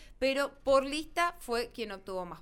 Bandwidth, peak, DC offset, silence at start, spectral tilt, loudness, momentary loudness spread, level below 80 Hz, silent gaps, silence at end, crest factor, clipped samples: 16.5 kHz; -14 dBFS; under 0.1%; 0 s; -3 dB/octave; -32 LUFS; 11 LU; -54 dBFS; none; 0 s; 18 dB; under 0.1%